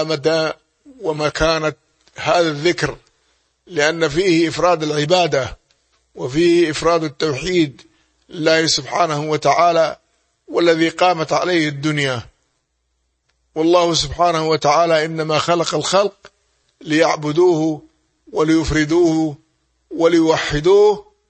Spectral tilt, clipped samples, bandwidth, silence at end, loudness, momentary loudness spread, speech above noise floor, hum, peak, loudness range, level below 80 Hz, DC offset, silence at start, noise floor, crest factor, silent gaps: -4.5 dB/octave; under 0.1%; 8.8 kHz; 0.3 s; -17 LUFS; 10 LU; 53 dB; none; 0 dBFS; 3 LU; -42 dBFS; under 0.1%; 0 s; -69 dBFS; 16 dB; none